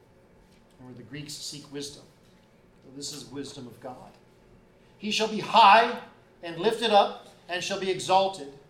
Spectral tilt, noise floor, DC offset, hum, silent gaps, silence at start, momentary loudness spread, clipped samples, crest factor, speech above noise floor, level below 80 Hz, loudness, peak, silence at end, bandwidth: -3 dB/octave; -58 dBFS; under 0.1%; none; none; 0.8 s; 24 LU; under 0.1%; 20 dB; 32 dB; -66 dBFS; -24 LUFS; -6 dBFS; 0.15 s; 16 kHz